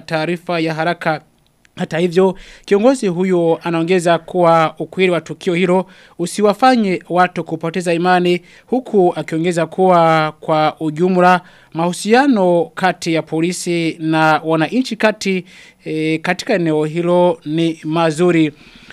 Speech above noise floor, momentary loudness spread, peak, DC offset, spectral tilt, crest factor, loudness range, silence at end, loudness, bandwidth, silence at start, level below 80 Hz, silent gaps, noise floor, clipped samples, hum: 32 dB; 8 LU; 0 dBFS; under 0.1%; -6 dB/octave; 16 dB; 2 LU; 0.4 s; -16 LUFS; 13.5 kHz; 0.1 s; -56 dBFS; none; -47 dBFS; under 0.1%; none